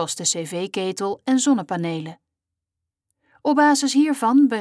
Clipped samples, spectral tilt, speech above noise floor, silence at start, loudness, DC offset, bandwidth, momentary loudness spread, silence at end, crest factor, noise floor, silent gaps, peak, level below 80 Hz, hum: under 0.1%; -3.5 dB/octave; 64 dB; 0 s; -20 LUFS; under 0.1%; 11 kHz; 11 LU; 0 s; 14 dB; -84 dBFS; none; -6 dBFS; -76 dBFS; none